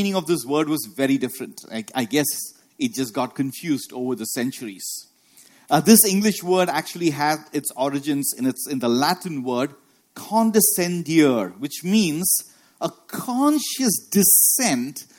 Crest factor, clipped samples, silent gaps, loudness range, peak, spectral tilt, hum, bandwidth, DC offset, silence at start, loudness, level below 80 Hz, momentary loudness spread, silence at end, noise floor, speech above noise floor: 22 dB; under 0.1%; none; 6 LU; 0 dBFS; -3.5 dB/octave; none; 17.5 kHz; under 0.1%; 0 s; -20 LUFS; -68 dBFS; 15 LU; 0.15 s; -53 dBFS; 32 dB